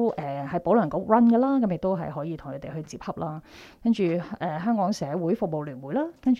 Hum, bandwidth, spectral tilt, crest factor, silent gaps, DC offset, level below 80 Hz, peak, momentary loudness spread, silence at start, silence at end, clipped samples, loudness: none; 7.6 kHz; -8 dB/octave; 18 dB; none; under 0.1%; -58 dBFS; -6 dBFS; 15 LU; 0 s; 0 s; under 0.1%; -26 LUFS